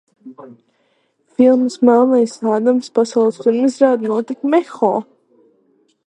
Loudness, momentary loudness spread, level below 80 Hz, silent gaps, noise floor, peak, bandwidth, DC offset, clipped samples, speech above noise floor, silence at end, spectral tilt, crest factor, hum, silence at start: -15 LUFS; 6 LU; -66 dBFS; none; -62 dBFS; 0 dBFS; 9.6 kHz; under 0.1%; under 0.1%; 47 dB; 1.05 s; -6 dB/octave; 16 dB; none; 0.25 s